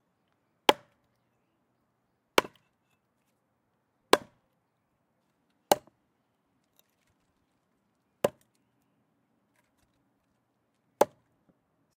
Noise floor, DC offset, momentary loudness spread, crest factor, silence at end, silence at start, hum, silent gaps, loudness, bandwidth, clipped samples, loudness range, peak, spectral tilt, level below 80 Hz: -76 dBFS; under 0.1%; 7 LU; 36 dB; 0.95 s; 0.7 s; none; none; -29 LUFS; 15.5 kHz; under 0.1%; 9 LU; 0 dBFS; -2.5 dB/octave; -76 dBFS